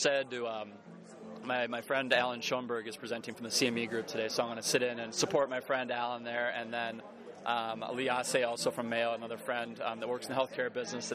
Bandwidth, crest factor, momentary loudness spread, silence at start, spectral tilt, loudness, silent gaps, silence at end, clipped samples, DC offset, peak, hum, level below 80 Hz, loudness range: 15.5 kHz; 22 dB; 9 LU; 0 s; -2.5 dB/octave; -34 LUFS; none; 0 s; under 0.1%; under 0.1%; -12 dBFS; none; -80 dBFS; 2 LU